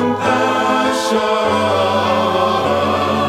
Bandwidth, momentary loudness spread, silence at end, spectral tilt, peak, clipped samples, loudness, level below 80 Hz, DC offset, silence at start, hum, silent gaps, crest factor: 16 kHz; 1 LU; 0 s; -4.5 dB/octave; -2 dBFS; under 0.1%; -15 LUFS; -54 dBFS; under 0.1%; 0 s; none; none; 12 dB